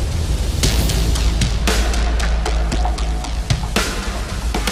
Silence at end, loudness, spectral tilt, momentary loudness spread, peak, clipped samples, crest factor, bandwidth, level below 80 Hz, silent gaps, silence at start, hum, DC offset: 0 s; -20 LUFS; -4 dB/octave; 5 LU; -2 dBFS; under 0.1%; 14 dB; 16 kHz; -20 dBFS; none; 0 s; none; under 0.1%